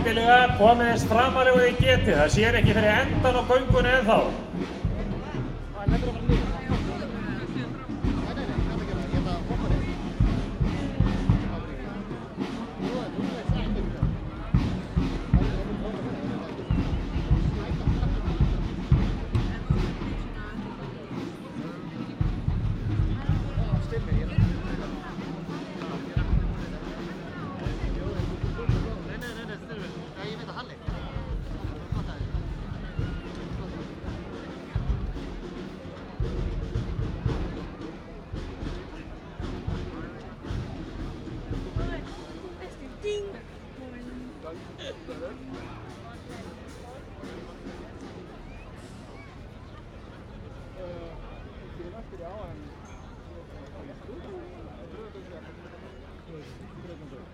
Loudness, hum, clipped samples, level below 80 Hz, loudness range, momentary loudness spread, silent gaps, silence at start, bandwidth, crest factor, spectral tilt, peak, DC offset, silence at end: -28 LUFS; none; under 0.1%; -34 dBFS; 18 LU; 22 LU; none; 0 s; 13 kHz; 22 dB; -6.5 dB/octave; -6 dBFS; under 0.1%; 0 s